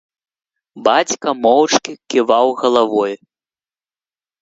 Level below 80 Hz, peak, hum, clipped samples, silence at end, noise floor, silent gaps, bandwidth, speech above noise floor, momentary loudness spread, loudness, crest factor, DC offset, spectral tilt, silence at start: -62 dBFS; 0 dBFS; none; under 0.1%; 1.25 s; under -90 dBFS; none; 8 kHz; over 75 dB; 6 LU; -15 LUFS; 18 dB; under 0.1%; -2.5 dB/octave; 0.75 s